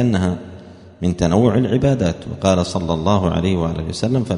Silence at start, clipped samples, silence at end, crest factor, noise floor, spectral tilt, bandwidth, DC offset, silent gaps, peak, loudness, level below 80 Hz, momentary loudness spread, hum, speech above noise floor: 0 s; under 0.1%; 0 s; 18 dB; -39 dBFS; -7 dB/octave; 10.5 kHz; under 0.1%; none; 0 dBFS; -18 LUFS; -38 dBFS; 7 LU; none; 22 dB